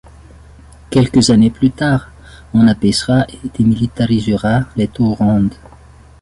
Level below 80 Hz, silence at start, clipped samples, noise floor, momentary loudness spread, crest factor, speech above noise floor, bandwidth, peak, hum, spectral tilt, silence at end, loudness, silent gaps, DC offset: -36 dBFS; 0.9 s; under 0.1%; -41 dBFS; 7 LU; 14 dB; 28 dB; 11.5 kHz; -2 dBFS; none; -6 dB/octave; 0.65 s; -14 LUFS; none; under 0.1%